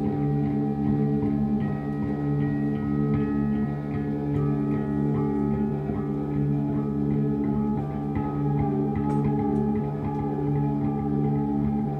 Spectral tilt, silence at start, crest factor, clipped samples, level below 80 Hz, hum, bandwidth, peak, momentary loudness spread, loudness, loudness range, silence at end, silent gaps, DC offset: -11 dB/octave; 0 s; 12 dB; under 0.1%; -42 dBFS; none; 4.2 kHz; -14 dBFS; 4 LU; -26 LUFS; 1 LU; 0 s; none; under 0.1%